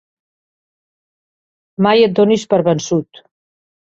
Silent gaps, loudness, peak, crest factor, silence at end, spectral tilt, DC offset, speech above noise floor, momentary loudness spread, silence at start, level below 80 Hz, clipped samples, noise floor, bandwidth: none; -14 LUFS; -2 dBFS; 16 dB; 0.85 s; -5.5 dB/octave; under 0.1%; over 77 dB; 9 LU; 1.8 s; -58 dBFS; under 0.1%; under -90 dBFS; 7.8 kHz